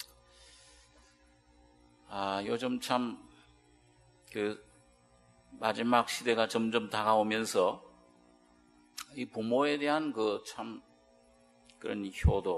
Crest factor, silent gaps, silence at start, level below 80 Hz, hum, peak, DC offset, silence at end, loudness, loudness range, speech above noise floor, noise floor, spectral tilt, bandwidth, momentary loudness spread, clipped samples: 24 dB; none; 0 s; -48 dBFS; none; -10 dBFS; under 0.1%; 0 s; -32 LUFS; 7 LU; 33 dB; -64 dBFS; -5 dB/octave; 13 kHz; 16 LU; under 0.1%